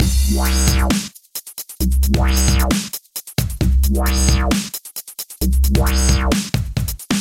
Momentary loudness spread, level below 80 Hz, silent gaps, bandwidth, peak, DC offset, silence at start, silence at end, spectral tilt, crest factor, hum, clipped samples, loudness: 12 LU; -18 dBFS; none; 17 kHz; -2 dBFS; under 0.1%; 0 s; 0 s; -4.5 dB/octave; 14 dB; none; under 0.1%; -18 LUFS